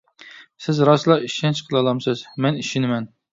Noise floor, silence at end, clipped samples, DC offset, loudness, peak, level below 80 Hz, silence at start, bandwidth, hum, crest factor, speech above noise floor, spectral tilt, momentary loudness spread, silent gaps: -45 dBFS; 0.25 s; under 0.1%; under 0.1%; -20 LUFS; -2 dBFS; -64 dBFS; 0.2 s; 7.8 kHz; none; 20 dB; 26 dB; -6 dB/octave; 9 LU; none